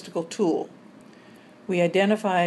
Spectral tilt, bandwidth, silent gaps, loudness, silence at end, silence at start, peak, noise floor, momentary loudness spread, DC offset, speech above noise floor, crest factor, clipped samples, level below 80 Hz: -6 dB/octave; 12 kHz; none; -24 LUFS; 0 s; 0 s; -8 dBFS; -49 dBFS; 15 LU; under 0.1%; 27 dB; 16 dB; under 0.1%; -76 dBFS